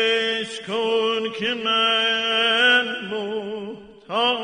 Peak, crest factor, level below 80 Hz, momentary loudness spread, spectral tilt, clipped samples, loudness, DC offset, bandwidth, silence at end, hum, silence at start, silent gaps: -6 dBFS; 16 dB; -68 dBFS; 13 LU; -2.5 dB/octave; under 0.1%; -20 LUFS; under 0.1%; 10 kHz; 0 s; none; 0 s; none